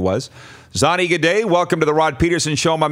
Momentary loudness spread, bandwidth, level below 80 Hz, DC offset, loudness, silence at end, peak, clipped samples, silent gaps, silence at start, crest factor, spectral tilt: 8 LU; 16 kHz; -40 dBFS; under 0.1%; -17 LUFS; 0 s; 0 dBFS; under 0.1%; none; 0 s; 16 dB; -4.5 dB/octave